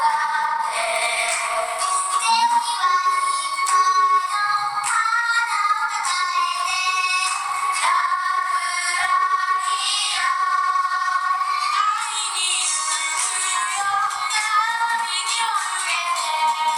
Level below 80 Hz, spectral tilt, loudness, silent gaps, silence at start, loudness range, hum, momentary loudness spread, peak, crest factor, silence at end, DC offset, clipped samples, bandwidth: -68 dBFS; 3 dB/octave; -20 LUFS; none; 0 s; 1 LU; none; 3 LU; -6 dBFS; 14 dB; 0 s; under 0.1%; under 0.1%; 18.5 kHz